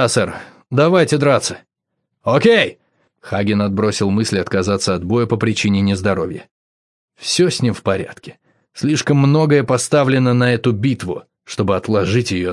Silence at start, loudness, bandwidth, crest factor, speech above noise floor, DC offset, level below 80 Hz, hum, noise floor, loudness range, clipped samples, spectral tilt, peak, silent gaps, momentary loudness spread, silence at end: 0 s; -16 LUFS; 12 kHz; 16 dB; 59 dB; under 0.1%; -56 dBFS; none; -75 dBFS; 3 LU; under 0.1%; -5.5 dB/octave; 0 dBFS; 6.51-7.08 s; 11 LU; 0 s